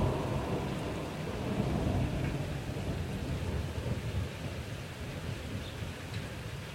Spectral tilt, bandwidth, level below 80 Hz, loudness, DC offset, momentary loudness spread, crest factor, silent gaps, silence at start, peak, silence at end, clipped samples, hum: -6.5 dB/octave; 16.5 kHz; -44 dBFS; -36 LUFS; under 0.1%; 8 LU; 16 dB; none; 0 s; -20 dBFS; 0 s; under 0.1%; none